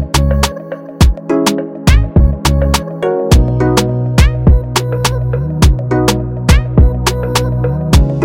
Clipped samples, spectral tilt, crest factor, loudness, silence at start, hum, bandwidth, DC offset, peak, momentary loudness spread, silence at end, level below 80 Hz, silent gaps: under 0.1%; -5.5 dB/octave; 10 dB; -13 LUFS; 0 s; none; 16.5 kHz; under 0.1%; 0 dBFS; 5 LU; 0 s; -14 dBFS; none